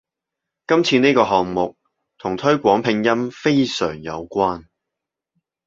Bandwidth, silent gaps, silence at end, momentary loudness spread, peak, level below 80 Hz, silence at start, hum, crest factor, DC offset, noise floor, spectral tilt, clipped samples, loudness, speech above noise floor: 7.8 kHz; none; 1.05 s; 12 LU; -2 dBFS; -54 dBFS; 0.7 s; none; 18 dB; under 0.1%; -84 dBFS; -5.5 dB/octave; under 0.1%; -19 LUFS; 66 dB